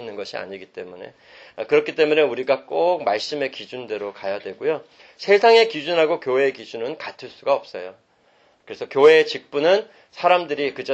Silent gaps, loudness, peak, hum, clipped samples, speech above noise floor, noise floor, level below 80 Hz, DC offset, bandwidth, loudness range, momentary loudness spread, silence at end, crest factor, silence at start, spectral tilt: none; -20 LUFS; -2 dBFS; none; under 0.1%; 38 dB; -59 dBFS; -72 dBFS; under 0.1%; 8 kHz; 3 LU; 20 LU; 0 s; 18 dB; 0 s; -4 dB/octave